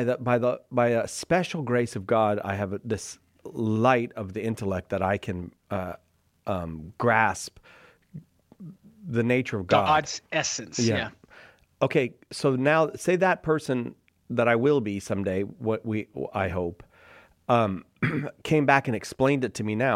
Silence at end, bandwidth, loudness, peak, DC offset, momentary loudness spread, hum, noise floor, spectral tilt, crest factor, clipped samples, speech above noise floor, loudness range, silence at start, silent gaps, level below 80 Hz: 0 s; 14.5 kHz; -26 LUFS; -4 dBFS; under 0.1%; 13 LU; none; -54 dBFS; -5.5 dB/octave; 22 dB; under 0.1%; 29 dB; 4 LU; 0 s; none; -58 dBFS